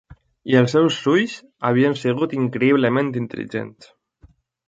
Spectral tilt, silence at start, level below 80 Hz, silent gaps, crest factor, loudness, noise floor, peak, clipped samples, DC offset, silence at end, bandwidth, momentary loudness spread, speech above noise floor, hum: -6.5 dB/octave; 0.45 s; -60 dBFS; none; 18 dB; -20 LUFS; -54 dBFS; -2 dBFS; under 0.1%; under 0.1%; 0.95 s; 7.8 kHz; 12 LU; 34 dB; none